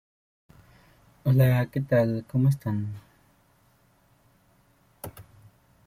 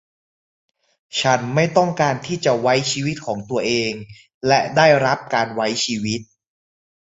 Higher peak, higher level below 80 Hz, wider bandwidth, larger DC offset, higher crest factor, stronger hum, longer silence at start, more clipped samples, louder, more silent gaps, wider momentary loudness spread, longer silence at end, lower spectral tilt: second, -10 dBFS vs -2 dBFS; about the same, -58 dBFS vs -58 dBFS; first, 16 kHz vs 8 kHz; neither; about the same, 20 dB vs 18 dB; neither; about the same, 1.25 s vs 1.15 s; neither; second, -25 LUFS vs -19 LUFS; second, none vs 4.34-4.41 s; first, 22 LU vs 11 LU; second, 0.65 s vs 0.8 s; first, -8.5 dB/octave vs -4 dB/octave